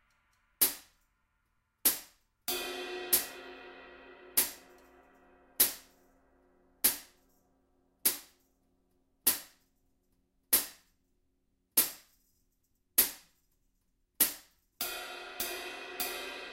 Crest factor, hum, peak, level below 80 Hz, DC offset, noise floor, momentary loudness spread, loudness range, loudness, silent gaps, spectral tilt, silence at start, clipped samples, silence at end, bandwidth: 28 dB; none; -10 dBFS; -70 dBFS; under 0.1%; -77 dBFS; 20 LU; 3 LU; -31 LUFS; none; 0.5 dB/octave; 0.6 s; under 0.1%; 0 s; 16 kHz